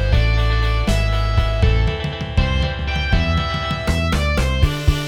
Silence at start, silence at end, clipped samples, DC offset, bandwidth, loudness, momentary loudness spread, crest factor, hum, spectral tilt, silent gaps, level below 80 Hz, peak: 0 s; 0 s; under 0.1%; under 0.1%; 14 kHz; -19 LUFS; 4 LU; 16 dB; none; -6 dB/octave; none; -20 dBFS; 0 dBFS